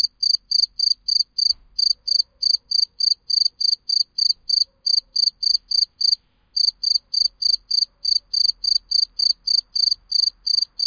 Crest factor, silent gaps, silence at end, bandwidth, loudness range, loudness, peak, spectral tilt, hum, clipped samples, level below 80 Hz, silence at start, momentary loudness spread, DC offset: 14 dB; none; 0 s; 5.2 kHz; 1 LU; -17 LUFS; -6 dBFS; 3 dB/octave; none; under 0.1%; -60 dBFS; 0 s; 3 LU; under 0.1%